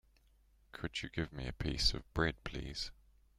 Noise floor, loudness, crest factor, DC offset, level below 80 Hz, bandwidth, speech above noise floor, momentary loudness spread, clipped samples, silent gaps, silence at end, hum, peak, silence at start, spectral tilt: -69 dBFS; -39 LUFS; 24 dB; under 0.1%; -48 dBFS; 15 kHz; 30 dB; 12 LU; under 0.1%; none; 0.45 s; none; -16 dBFS; 0.75 s; -4 dB/octave